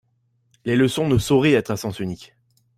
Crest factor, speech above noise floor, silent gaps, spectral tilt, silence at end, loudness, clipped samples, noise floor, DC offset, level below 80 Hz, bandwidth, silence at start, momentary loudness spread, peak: 16 dB; 46 dB; none; -6 dB/octave; 0.55 s; -20 LUFS; under 0.1%; -66 dBFS; under 0.1%; -48 dBFS; 16 kHz; 0.65 s; 14 LU; -6 dBFS